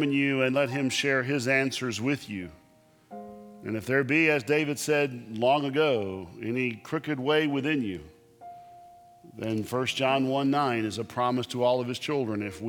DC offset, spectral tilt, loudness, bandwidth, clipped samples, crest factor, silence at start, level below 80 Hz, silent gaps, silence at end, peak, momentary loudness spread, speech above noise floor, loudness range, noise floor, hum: under 0.1%; -5 dB/octave; -27 LUFS; 18.5 kHz; under 0.1%; 18 dB; 0 s; -66 dBFS; none; 0 s; -10 dBFS; 14 LU; 33 dB; 4 LU; -60 dBFS; none